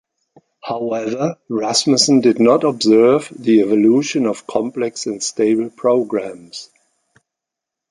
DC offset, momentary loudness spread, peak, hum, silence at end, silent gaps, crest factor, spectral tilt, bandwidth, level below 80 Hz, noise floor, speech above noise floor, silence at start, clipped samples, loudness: under 0.1%; 12 LU; 0 dBFS; none; 1.25 s; none; 16 dB; -4 dB/octave; 11.5 kHz; -62 dBFS; -83 dBFS; 68 dB; 0.65 s; under 0.1%; -16 LUFS